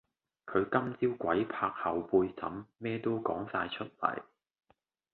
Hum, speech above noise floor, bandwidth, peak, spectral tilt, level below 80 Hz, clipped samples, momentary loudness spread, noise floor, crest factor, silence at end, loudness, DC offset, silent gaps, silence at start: none; 40 dB; 4.4 kHz; -12 dBFS; -9.5 dB/octave; -66 dBFS; under 0.1%; 10 LU; -73 dBFS; 22 dB; 0.9 s; -33 LUFS; under 0.1%; none; 0.45 s